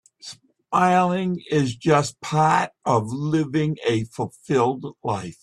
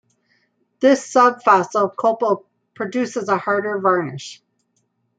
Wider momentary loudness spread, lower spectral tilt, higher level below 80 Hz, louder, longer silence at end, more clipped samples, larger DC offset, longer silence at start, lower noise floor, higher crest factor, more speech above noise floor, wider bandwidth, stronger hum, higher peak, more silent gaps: about the same, 11 LU vs 13 LU; about the same, -6 dB/octave vs -5 dB/octave; first, -60 dBFS vs -72 dBFS; second, -22 LUFS vs -18 LUFS; second, 0.1 s vs 0.85 s; neither; neither; second, 0.25 s vs 0.8 s; second, -44 dBFS vs -68 dBFS; about the same, 18 dB vs 18 dB; second, 22 dB vs 50 dB; first, 12 kHz vs 9.4 kHz; neither; about the same, -4 dBFS vs -2 dBFS; neither